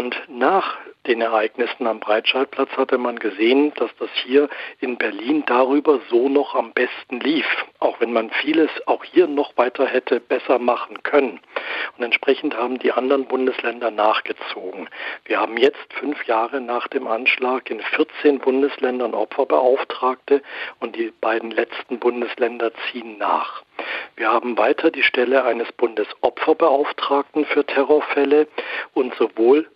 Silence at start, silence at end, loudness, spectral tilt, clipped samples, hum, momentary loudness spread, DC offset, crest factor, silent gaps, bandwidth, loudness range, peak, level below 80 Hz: 0 s; 0.1 s; -20 LUFS; -6 dB/octave; under 0.1%; none; 9 LU; under 0.1%; 16 dB; none; 5.6 kHz; 3 LU; -2 dBFS; -74 dBFS